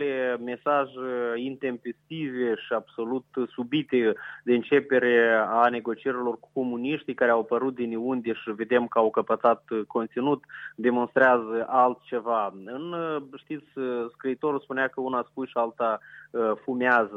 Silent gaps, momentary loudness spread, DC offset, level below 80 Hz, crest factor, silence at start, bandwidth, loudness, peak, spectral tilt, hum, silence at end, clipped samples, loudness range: none; 11 LU; under 0.1%; -78 dBFS; 20 dB; 0 s; 5.4 kHz; -26 LUFS; -6 dBFS; -7.5 dB/octave; none; 0 s; under 0.1%; 6 LU